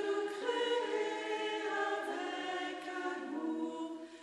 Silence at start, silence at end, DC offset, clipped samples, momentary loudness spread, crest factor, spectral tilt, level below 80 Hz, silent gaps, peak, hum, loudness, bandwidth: 0 s; 0 s; under 0.1%; under 0.1%; 6 LU; 16 dB; -2 dB/octave; -84 dBFS; none; -22 dBFS; none; -37 LUFS; 12 kHz